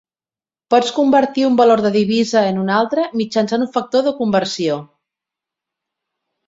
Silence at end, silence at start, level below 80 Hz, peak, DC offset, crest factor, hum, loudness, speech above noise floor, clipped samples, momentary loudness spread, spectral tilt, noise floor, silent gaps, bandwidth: 1.65 s; 0.7 s; -60 dBFS; -2 dBFS; under 0.1%; 16 dB; none; -16 LUFS; over 75 dB; under 0.1%; 6 LU; -5.5 dB/octave; under -90 dBFS; none; 8 kHz